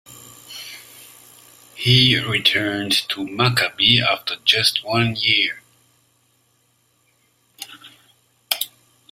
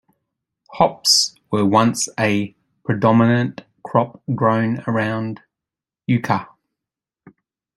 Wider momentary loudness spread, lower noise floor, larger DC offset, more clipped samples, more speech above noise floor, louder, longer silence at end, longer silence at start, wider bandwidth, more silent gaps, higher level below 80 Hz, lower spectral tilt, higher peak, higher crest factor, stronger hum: first, 23 LU vs 14 LU; second, -63 dBFS vs -88 dBFS; neither; neither; second, 44 dB vs 70 dB; about the same, -17 LUFS vs -18 LUFS; second, 0.45 s vs 1.3 s; second, 0.1 s vs 0.7 s; first, 16 kHz vs 14 kHz; neither; about the same, -54 dBFS vs -58 dBFS; about the same, -3.5 dB/octave vs -4.5 dB/octave; about the same, 0 dBFS vs -2 dBFS; about the same, 22 dB vs 18 dB; neither